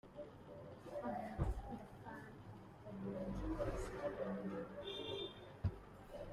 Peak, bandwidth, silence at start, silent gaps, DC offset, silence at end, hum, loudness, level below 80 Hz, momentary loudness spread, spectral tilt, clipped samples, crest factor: -28 dBFS; 14 kHz; 0.05 s; none; under 0.1%; 0 s; none; -47 LUFS; -54 dBFS; 12 LU; -6.5 dB/octave; under 0.1%; 20 dB